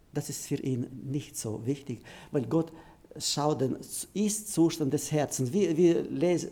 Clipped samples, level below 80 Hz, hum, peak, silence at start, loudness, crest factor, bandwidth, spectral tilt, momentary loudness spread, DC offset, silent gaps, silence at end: under 0.1%; -62 dBFS; none; -14 dBFS; 0.15 s; -30 LUFS; 16 dB; 19 kHz; -5.5 dB/octave; 11 LU; under 0.1%; none; 0 s